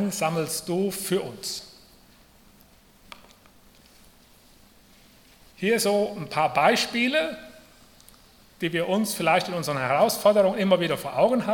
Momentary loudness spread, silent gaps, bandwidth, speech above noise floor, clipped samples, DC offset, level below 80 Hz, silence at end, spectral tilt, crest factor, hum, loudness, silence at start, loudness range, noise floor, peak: 11 LU; none; 18 kHz; 32 dB; under 0.1%; under 0.1%; -62 dBFS; 0 s; -4 dB/octave; 20 dB; none; -24 LUFS; 0 s; 11 LU; -55 dBFS; -6 dBFS